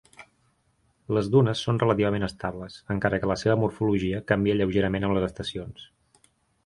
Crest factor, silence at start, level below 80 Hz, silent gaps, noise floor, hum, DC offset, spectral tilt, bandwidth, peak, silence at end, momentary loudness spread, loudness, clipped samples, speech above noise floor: 20 dB; 0.2 s; -48 dBFS; none; -68 dBFS; none; under 0.1%; -7 dB/octave; 11.5 kHz; -6 dBFS; 0.8 s; 12 LU; -25 LUFS; under 0.1%; 43 dB